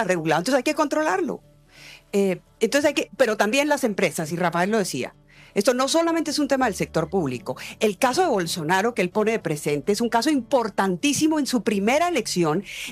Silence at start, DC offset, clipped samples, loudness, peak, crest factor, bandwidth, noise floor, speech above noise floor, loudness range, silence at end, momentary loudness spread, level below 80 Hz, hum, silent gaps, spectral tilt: 0 s; under 0.1%; under 0.1%; -22 LUFS; -8 dBFS; 14 dB; 15.5 kHz; -47 dBFS; 25 dB; 1 LU; 0 s; 6 LU; -58 dBFS; none; none; -4 dB/octave